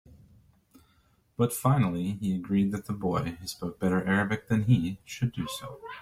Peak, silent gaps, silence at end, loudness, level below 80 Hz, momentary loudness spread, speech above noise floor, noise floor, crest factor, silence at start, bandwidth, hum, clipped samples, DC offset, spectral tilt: -10 dBFS; none; 0 s; -29 LUFS; -58 dBFS; 11 LU; 38 dB; -66 dBFS; 18 dB; 0.1 s; 16 kHz; none; under 0.1%; under 0.1%; -6.5 dB/octave